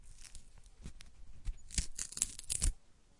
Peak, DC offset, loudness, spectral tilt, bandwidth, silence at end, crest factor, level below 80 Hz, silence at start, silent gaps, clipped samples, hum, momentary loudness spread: -8 dBFS; under 0.1%; -38 LUFS; -1.5 dB/octave; 11.5 kHz; 0.05 s; 32 dB; -44 dBFS; 0 s; none; under 0.1%; none; 23 LU